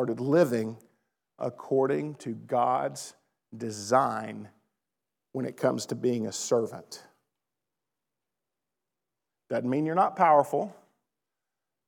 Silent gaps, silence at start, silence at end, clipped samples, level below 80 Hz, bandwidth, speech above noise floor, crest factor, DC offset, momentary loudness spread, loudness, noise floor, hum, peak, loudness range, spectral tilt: none; 0 s; 1.15 s; under 0.1%; under -90 dBFS; 19 kHz; 61 dB; 22 dB; under 0.1%; 16 LU; -28 LUFS; -88 dBFS; none; -8 dBFS; 7 LU; -5.5 dB/octave